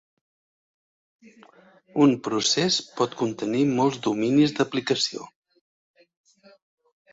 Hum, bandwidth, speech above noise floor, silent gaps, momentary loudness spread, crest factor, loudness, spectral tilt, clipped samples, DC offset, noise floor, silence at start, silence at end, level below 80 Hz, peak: none; 8 kHz; over 66 dB; none; 7 LU; 20 dB; -23 LUFS; -4.5 dB/octave; under 0.1%; under 0.1%; under -90 dBFS; 1.95 s; 1.85 s; -66 dBFS; -6 dBFS